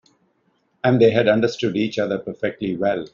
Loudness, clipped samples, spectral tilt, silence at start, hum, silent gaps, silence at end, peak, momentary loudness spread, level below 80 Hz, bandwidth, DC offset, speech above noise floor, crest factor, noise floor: -20 LUFS; under 0.1%; -5 dB/octave; 0.85 s; none; none; 0.05 s; -4 dBFS; 10 LU; -60 dBFS; 7.4 kHz; under 0.1%; 46 dB; 18 dB; -66 dBFS